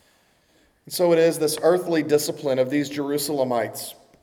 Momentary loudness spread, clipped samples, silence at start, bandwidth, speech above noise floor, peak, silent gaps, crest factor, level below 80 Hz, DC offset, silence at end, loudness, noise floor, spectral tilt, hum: 10 LU; under 0.1%; 0.85 s; 18.5 kHz; 40 dB; -6 dBFS; none; 16 dB; -70 dBFS; under 0.1%; 0.3 s; -22 LUFS; -61 dBFS; -4.5 dB/octave; none